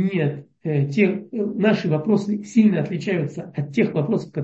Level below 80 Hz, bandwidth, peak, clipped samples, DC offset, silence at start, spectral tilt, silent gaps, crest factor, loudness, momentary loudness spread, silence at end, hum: -66 dBFS; 8 kHz; -4 dBFS; under 0.1%; under 0.1%; 0 s; -8 dB/octave; none; 16 dB; -22 LUFS; 8 LU; 0 s; none